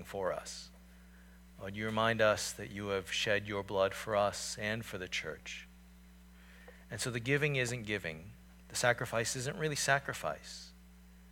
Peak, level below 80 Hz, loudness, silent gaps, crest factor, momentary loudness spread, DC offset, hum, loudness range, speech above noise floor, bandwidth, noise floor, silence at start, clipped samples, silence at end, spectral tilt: -14 dBFS; -60 dBFS; -35 LUFS; none; 22 dB; 17 LU; under 0.1%; none; 4 LU; 22 dB; 19 kHz; -57 dBFS; 0 s; under 0.1%; 0 s; -3.5 dB/octave